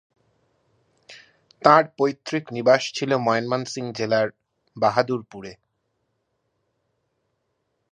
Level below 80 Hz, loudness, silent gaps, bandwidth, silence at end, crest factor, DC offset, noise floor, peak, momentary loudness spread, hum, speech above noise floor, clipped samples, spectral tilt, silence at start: -70 dBFS; -22 LUFS; none; 10 kHz; 2.4 s; 24 dB; under 0.1%; -74 dBFS; 0 dBFS; 13 LU; none; 53 dB; under 0.1%; -5 dB/octave; 1.1 s